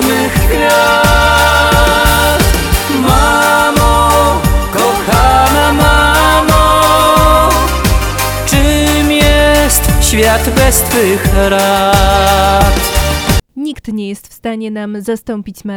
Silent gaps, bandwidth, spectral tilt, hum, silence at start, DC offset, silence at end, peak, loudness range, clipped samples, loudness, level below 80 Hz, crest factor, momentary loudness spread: none; 18 kHz; -4 dB/octave; none; 0 s; under 0.1%; 0 s; 0 dBFS; 3 LU; 0.3%; -9 LUFS; -16 dBFS; 10 dB; 12 LU